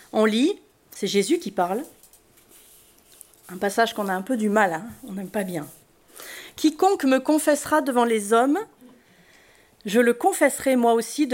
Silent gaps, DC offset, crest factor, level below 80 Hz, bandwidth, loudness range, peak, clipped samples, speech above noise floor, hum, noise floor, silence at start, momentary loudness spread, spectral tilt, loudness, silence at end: none; under 0.1%; 18 dB; -66 dBFS; 16.5 kHz; 5 LU; -6 dBFS; under 0.1%; 33 dB; none; -55 dBFS; 0.15 s; 18 LU; -4 dB/octave; -22 LUFS; 0 s